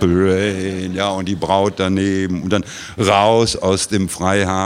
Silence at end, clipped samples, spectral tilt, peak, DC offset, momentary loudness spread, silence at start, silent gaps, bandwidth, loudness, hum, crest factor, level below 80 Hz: 0 s; under 0.1%; -5 dB/octave; 0 dBFS; under 0.1%; 7 LU; 0 s; none; 15 kHz; -17 LUFS; none; 16 dB; -44 dBFS